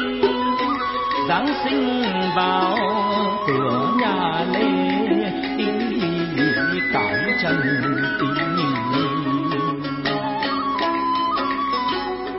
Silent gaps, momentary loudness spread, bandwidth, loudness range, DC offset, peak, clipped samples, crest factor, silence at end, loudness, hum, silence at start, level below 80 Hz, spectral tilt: none; 3 LU; 5.8 kHz; 2 LU; under 0.1%; -6 dBFS; under 0.1%; 14 dB; 0 s; -21 LUFS; none; 0 s; -52 dBFS; -9.5 dB/octave